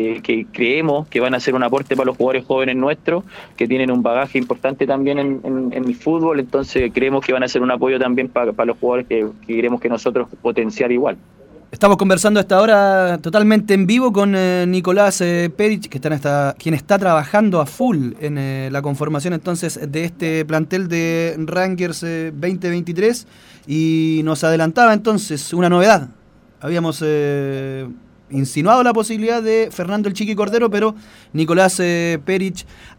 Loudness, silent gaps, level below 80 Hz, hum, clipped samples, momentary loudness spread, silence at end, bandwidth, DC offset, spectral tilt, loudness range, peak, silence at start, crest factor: -17 LUFS; none; -52 dBFS; none; under 0.1%; 9 LU; 0.1 s; 18 kHz; under 0.1%; -5.5 dB/octave; 6 LU; -2 dBFS; 0 s; 16 dB